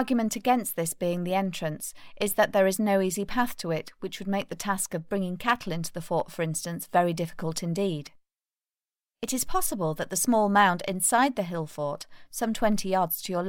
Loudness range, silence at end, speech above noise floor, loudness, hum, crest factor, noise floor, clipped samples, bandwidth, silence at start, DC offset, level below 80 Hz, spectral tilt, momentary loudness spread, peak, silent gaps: 5 LU; 0 s; over 63 dB; -27 LUFS; none; 18 dB; under -90 dBFS; under 0.1%; 17 kHz; 0 s; under 0.1%; -52 dBFS; -4 dB/octave; 10 LU; -8 dBFS; none